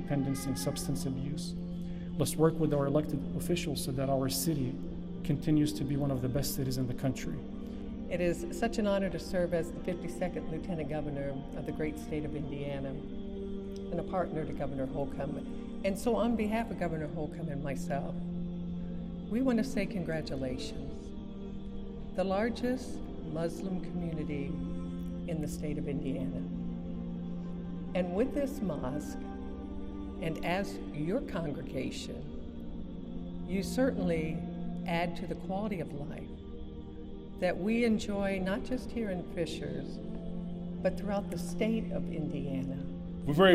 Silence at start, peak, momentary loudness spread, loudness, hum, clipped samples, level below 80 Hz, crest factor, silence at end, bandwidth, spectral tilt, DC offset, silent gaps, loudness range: 0 s; -10 dBFS; 11 LU; -35 LUFS; none; under 0.1%; -46 dBFS; 24 dB; 0 s; 15.5 kHz; -6 dB/octave; under 0.1%; none; 5 LU